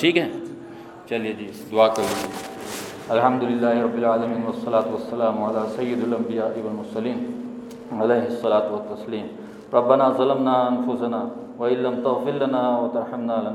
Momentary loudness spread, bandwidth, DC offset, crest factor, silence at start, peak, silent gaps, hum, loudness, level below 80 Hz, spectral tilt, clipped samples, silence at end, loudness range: 13 LU; 17 kHz; under 0.1%; 20 dB; 0 s; -2 dBFS; none; none; -23 LUFS; -66 dBFS; -5.5 dB/octave; under 0.1%; 0 s; 4 LU